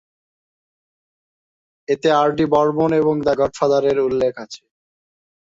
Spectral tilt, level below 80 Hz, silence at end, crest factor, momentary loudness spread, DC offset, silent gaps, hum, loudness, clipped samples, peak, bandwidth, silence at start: -6.5 dB/octave; -54 dBFS; 0.85 s; 16 dB; 18 LU; under 0.1%; none; none; -18 LUFS; under 0.1%; -4 dBFS; 7.8 kHz; 1.9 s